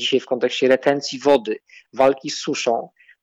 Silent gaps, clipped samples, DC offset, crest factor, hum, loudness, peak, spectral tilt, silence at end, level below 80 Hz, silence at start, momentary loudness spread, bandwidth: none; under 0.1%; under 0.1%; 16 dB; none; -20 LUFS; -4 dBFS; -3.5 dB/octave; 0.35 s; -64 dBFS; 0 s; 12 LU; 9.4 kHz